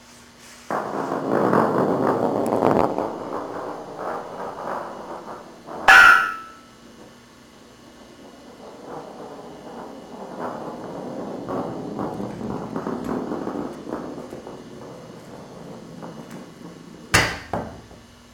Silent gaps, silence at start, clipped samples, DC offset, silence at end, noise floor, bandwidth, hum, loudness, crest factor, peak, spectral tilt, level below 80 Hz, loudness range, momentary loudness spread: none; 0.1 s; under 0.1%; under 0.1%; 0.25 s; -48 dBFS; 19 kHz; none; -21 LUFS; 24 dB; 0 dBFS; -4 dB/octave; -52 dBFS; 19 LU; 20 LU